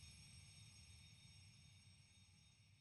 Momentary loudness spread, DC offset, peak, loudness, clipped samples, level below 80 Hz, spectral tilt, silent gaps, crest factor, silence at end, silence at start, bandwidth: 7 LU; under 0.1%; -50 dBFS; -64 LUFS; under 0.1%; -76 dBFS; -2.5 dB/octave; none; 16 dB; 0 s; 0 s; 13.5 kHz